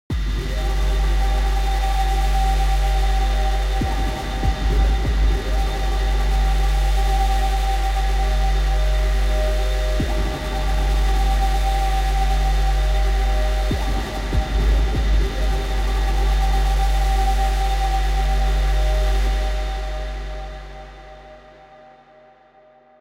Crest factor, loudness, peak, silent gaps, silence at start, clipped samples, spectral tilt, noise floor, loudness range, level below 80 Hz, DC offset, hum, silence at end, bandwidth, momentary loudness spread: 12 dB; -22 LUFS; -8 dBFS; none; 0.1 s; under 0.1%; -5 dB/octave; -51 dBFS; 3 LU; -20 dBFS; under 0.1%; none; 1.6 s; 14.5 kHz; 4 LU